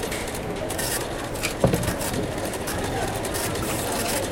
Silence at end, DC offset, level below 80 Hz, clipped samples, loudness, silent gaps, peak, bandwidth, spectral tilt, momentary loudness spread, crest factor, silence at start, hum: 0 s; under 0.1%; -38 dBFS; under 0.1%; -26 LUFS; none; -6 dBFS; 17 kHz; -4 dB/octave; 6 LU; 20 dB; 0 s; none